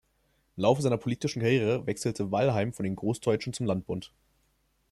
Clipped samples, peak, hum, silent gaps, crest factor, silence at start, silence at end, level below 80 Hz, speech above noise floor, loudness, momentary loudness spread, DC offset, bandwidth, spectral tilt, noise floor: under 0.1%; -8 dBFS; none; none; 20 dB; 0.55 s; 0.85 s; -62 dBFS; 43 dB; -29 LUFS; 7 LU; under 0.1%; 13.5 kHz; -6 dB/octave; -71 dBFS